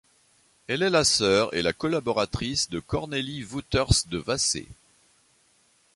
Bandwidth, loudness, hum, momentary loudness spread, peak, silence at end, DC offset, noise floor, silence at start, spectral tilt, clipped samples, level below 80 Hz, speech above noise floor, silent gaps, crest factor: 11.5 kHz; -25 LUFS; none; 10 LU; -6 dBFS; 1.25 s; under 0.1%; -64 dBFS; 0.7 s; -3.5 dB/octave; under 0.1%; -44 dBFS; 38 dB; none; 22 dB